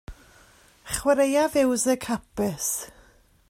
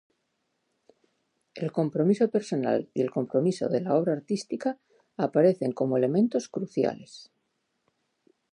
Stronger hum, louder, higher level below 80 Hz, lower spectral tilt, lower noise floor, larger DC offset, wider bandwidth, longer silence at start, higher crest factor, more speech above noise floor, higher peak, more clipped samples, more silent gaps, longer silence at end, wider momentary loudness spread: neither; first, -24 LUFS vs -27 LUFS; first, -50 dBFS vs -76 dBFS; second, -3.5 dB/octave vs -7.5 dB/octave; second, -57 dBFS vs -77 dBFS; neither; first, 16 kHz vs 10.5 kHz; second, 0.1 s vs 1.55 s; about the same, 18 dB vs 18 dB; second, 33 dB vs 51 dB; about the same, -8 dBFS vs -10 dBFS; neither; neither; second, 0.6 s vs 1.3 s; about the same, 10 LU vs 9 LU